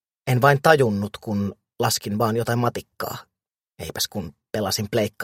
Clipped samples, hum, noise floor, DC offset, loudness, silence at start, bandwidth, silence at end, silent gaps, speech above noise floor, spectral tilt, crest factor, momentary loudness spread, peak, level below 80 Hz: under 0.1%; none; -57 dBFS; under 0.1%; -22 LUFS; 0.25 s; 16.5 kHz; 0 s; none; 35 dB; -5 dB/octave; 22 dB; 15 LU; 0 dBFS; -56 dBFS